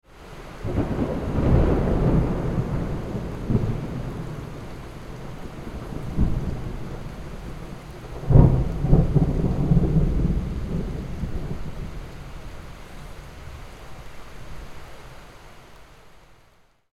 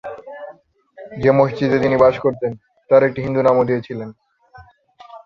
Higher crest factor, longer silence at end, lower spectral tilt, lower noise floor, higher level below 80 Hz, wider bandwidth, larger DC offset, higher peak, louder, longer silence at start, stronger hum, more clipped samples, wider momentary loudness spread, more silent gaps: first, 24 dB vs 18 dB; first, 0.6 s vs 0.05 s; about the same, -9 dB/octave vs -8.5 dB/octave; first, -57 dBFS vs -46 dBFS; first, -30 dBFS vs -52 dBFS; first, 12.5 kHz vs 6.8 kHz; neither; about the same, 0 dBFS vs 0 dBFS; second, -24 LUFS vs -17 LUFS; about the same, 0.15 s vs 0.05 s; neither; neither; about the same, 22 LU vs 21 LU; neither